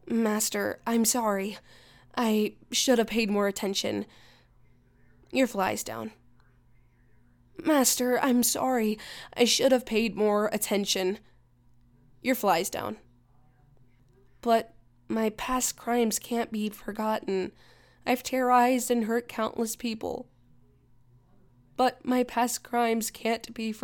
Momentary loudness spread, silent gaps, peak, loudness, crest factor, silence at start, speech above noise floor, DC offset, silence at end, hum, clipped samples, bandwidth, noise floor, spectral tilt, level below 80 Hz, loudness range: 12 LU; none; -8 dBFS; -27 LUFS; 20 dB; 0.05 s; 34 dB; under 0.1%; 0 s; none; under 0.1%; 19 kHz; -61 dBFS; -3 dB/octave; -60 dBFS; 7 LU